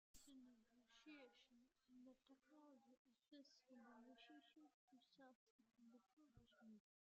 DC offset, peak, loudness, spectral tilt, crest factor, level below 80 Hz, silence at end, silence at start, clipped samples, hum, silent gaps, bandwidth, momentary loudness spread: under 0.1%; -54 dBFS; -68 LUFS; -3 dB/octave; 18 dB; under -90 dBFS; 0.3 s; 0.15 s; under 0.1%; none; 2.98-3.05 s, 4.74-4.88 s, 5.35-5.59 s, 6.13-6.17 s; 7.2 kHz; 3 LU